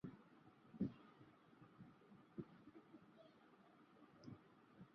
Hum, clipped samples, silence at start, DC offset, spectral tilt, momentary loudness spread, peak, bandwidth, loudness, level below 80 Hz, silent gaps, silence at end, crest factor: none; under 0.1%; 0.05 s; under 0.1%; -8 dB/octave; 19 LU; -32 dBFS; 5.8 kHz; -58 LUFS; -82 dBFS; none; 0 s; 26 dB